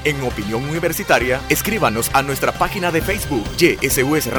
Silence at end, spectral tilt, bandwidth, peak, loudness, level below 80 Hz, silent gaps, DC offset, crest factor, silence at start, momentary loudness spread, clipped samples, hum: 0 s; -4 dB/octave; over 20 kHz; -2 dBFS; -18 LUFS; -34 dBFS; none; under 0.1%; 16 dB; 0 s; 6 LU; under 0.1%; none